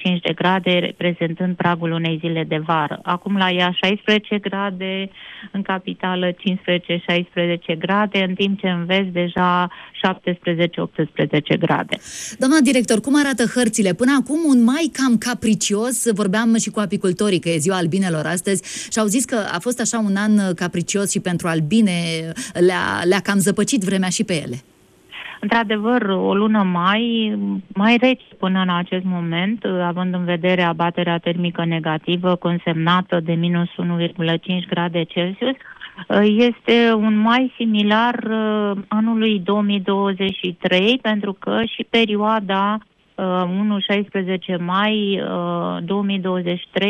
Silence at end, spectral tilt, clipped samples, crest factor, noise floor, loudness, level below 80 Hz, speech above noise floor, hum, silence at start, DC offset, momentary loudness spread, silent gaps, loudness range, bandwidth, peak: 0 s; -5 dB/octave; under 0.1%; 16 dB; -40 dBFS; -19 LUFS; -60 dBFS; 22 dB; none; 0 s; under 0.1%; 7 LU; none; 3 LU; 14.5 kHz; -4 dBFS